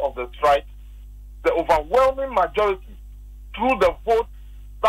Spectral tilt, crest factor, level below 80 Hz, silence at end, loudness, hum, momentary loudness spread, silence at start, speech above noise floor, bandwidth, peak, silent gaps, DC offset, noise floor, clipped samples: -5 dB/octave; 16 dB; -38 dBFS; 0 s; -21 LUFS; 50 Hz at -40 dBFS; 8 LU; 0 s; 19 dB; 16 kHz; -6 dBFS; none; under 0.1%; -39 dBFS; under 0.1%